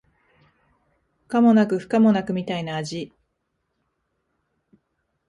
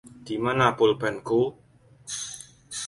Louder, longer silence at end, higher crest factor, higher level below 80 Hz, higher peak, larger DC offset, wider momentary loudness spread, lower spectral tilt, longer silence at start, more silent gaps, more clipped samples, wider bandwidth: first, -21 LUFS vs -25 LUFS; first, 2.25 s vs 0 s; about the same, 16 dB vs 20 dB; about the same, -64 dBFS vs -60 dBFS; about the same, -8 dBFS vs -6 dBFS; neither; about the same, 15 LU vs 16 LU; first, -7 dB/octave vs -4.5 dB/octave; first, 1.3 s vs 0.05 s; neither; neither; about the same, 10.5 kHz vs 11.5 kHz